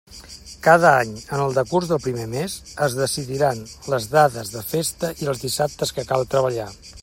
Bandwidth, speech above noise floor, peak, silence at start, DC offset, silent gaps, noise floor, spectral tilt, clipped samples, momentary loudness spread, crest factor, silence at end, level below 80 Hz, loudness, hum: 16.5 kHz; 20 dB; 0 dBFS; 0.1 s; under 0.1%; none; -41 dBFS; -4.5 dB/octave; under 0.1%; 13 LU; 20 dB; 0 s; -50 dBFS; -21 LUFS; none